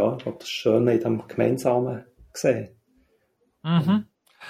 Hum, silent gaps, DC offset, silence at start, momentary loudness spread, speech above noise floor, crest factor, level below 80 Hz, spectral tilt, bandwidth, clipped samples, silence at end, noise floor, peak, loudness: none; none; under 0.1%; 0 s; 14 LU; 45 dB; 18 dB; -62 dBFS; -6.5 dB/octave; 15 kHz; under 0.1%; 0 s; -68 dBFS; -8 dBFS; -24 LUFS